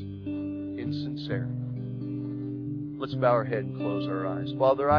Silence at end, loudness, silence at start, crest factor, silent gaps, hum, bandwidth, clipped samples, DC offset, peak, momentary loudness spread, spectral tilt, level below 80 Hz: 0 s; -30 LUFS; 0 s; 20 dB; none; none; 5.4 kHz; under 0.1%; under 0.1%; -10 dBFS; 10 LU; -9.5 dB/octave; -58 dBFS